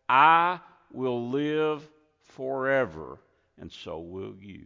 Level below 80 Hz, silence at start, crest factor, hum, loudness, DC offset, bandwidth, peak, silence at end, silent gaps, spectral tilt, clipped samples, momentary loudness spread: -62 dBFS; 0.1 s; 22 dB; none; -26 LUFS; under 0.1%; 7.6 kHz; -6 dBFS; 0.05 s; none; -6.5 dB/octave; under 0.1%; 23 LU